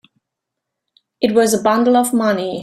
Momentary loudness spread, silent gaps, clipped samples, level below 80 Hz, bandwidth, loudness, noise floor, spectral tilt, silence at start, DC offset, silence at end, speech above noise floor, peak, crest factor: 4 LU; none; under 0.1%; -60 dBFS; 15.5 kHz; -15 LUFS; -80 dBFS; -4 dB/octave; 1.2 s; under 0.1%; 0 s; 66 dB; -2 dBFS; 16 dB